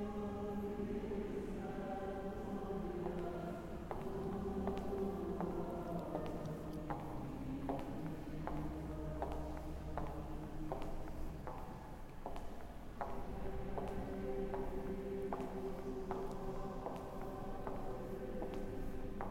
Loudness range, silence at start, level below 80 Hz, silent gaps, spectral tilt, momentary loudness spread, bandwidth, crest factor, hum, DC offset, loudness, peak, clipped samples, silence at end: 5 LU; 0 s; -50 dBFS; none; -8 dB/octave; 6 LU; 16 kHz; 18 dB; none; under 0.1%; -45 LUFS; -26 dBFS; under 0.1%; 0 s